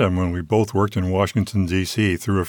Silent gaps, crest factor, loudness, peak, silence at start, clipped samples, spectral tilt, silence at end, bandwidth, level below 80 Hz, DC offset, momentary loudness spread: none; 16 dB; -21 LUFS; -4 dBFS; 0 s; under 0.1%; -6.5 dB/octave; 0 s; 19 kHz; -42 dBFS; under 0.1%; 2 LU